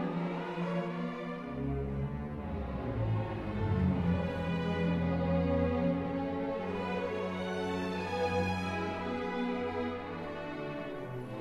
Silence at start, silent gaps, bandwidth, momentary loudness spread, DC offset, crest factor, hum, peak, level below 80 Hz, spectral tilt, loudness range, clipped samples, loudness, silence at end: 0 s; none; 10.5 kHz; 9 LU; under 0.1%; 16 dB; none; -18 dBFS; -46 dBFS; -8 dB/octave; 4 LU; under 0.1%; -35 LUFS; 0 s